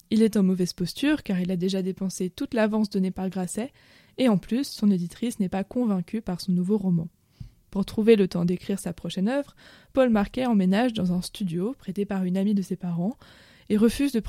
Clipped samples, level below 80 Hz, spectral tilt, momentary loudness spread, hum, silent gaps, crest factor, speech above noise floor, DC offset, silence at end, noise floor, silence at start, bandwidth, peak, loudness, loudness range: under 0.1%; -52 dBFS; -6.5 dB/octave; 9 LU; none; none; 20 dB; 22 dB; under 0.1%; 0 s; -46 dBFS; 0.1 s; 15.5 kHz; -6 dBFS; -25 LUFS; 2 LU